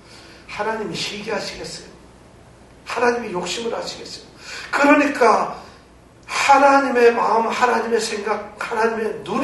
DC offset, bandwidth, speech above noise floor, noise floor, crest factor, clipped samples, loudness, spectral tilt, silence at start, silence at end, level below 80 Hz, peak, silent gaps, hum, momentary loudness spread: under 0.1%; 11.5 kHz; 28 dB; -47 dBFS; 20 dB; under 0.1%; -19 LUFS; -3.5 dB/octave; 0.1 s; 0 s; -54 dBFS; 0 dBFS; none; none; 19 LU